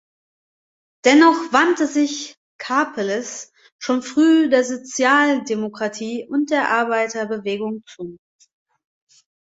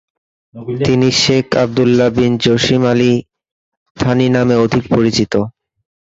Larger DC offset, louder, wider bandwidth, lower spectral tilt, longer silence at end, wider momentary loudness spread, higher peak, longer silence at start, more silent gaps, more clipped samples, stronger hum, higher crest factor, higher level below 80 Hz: neither; second, -18 LUFS vs -13 LUFS; about the same, 8 kHz vs 8 kHz; second, -3.5 dB/octave vs -5.5 dB/octave; first, 1.3 s vs 0.55 s; first, 17 LU vs 7 LU; about the same, -2 dBFS vs 0 dBFS; first, 1.05 s vs 0.55 s; second, 2.37-2.59 s, 3.72-3.79 s vs 3.52-3.95 s; neither; neither; about the same, 18 dB vs 14 dB; second, -68 dBFS vs -42 dBFS